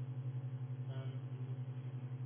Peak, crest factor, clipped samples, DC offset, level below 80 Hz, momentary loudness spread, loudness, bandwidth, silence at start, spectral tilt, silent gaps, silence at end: -34 dBFS; 8 dB; under 0.1%; under 0.1%; -82 dBFS; 2 LU; -45 LUFS; 3.5 kHz; 0 s; -9 dB/octave; none; 0 s